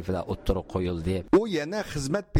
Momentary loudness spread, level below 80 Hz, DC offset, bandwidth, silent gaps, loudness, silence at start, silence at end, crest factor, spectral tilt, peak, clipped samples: 7 LU; -40 dBFS; under 0.1%; 16 kHz; none; -28 LUFS; 0 s; 0 s; 16 dB; -6.5 dB/octave; -10 dBFS; under 0.1%